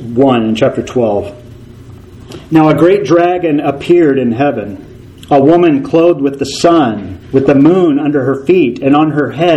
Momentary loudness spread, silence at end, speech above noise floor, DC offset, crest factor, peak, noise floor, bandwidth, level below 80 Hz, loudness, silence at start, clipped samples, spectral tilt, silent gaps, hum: 8 LU; 0 s; 23 dB; under 0.1%; 10 dB; 0 dBFS; -33 dBFS; 11.5 kHz; -44 dBFS; -10 LUFS; 0 s; 0.4%; -7 dB/octave; none; none